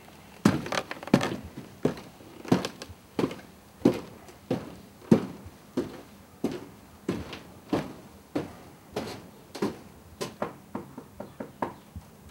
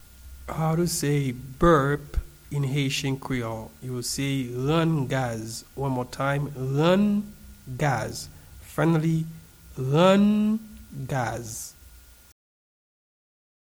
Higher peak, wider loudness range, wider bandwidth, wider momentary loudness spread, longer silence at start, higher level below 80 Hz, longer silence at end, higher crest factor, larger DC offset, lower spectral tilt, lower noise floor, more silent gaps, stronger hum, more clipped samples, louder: about the same, -6 dBFS vs -8 dBFS; first, 8 LU vs 3 LU; second, 16.5 kHz vs over 20 kHz; first, 21 LU vs 16 LU; second, 0 s vs 0.2 s; second, -58 dBFS vs -44 dBFS; second, 0 s vs 1.75 s; first, 26 dB vs 18 dB; neither; about the same, -6 dB/octave vs -6 dB/octave; about the same, -49 dBFS vs -50 dBFS; neither; neither; neither; second, -31 LUFS vs -25 LUFS